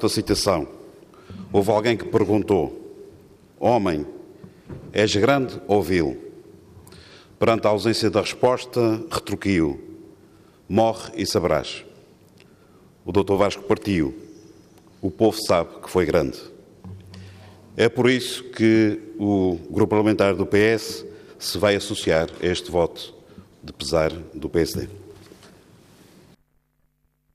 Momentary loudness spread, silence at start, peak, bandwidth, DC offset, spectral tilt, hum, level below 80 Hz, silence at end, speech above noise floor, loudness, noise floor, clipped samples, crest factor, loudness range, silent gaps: 20 LU; 0 s; -6 dBFS; 15.5 kHz; under 0.1%; -5.5 dB/octave; none; -50 dBFS; 2.2 s; 46 dB; -22 LUFS; -67 dBFS; under 0.1%; 18 dB; 5 LU; none